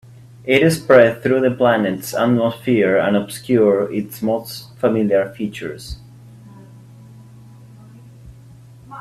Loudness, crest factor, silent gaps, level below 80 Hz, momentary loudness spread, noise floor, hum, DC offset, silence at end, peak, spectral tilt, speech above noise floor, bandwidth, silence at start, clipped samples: -17 LUFS; 18 dB; none; -48 dBFS; 18 LU; -42 dBFS; none; under 0.1%; 0 s; 0 dBFS; -6 dB/octave; 26 dB; 16 kHz; 0.45 s; under 0.1%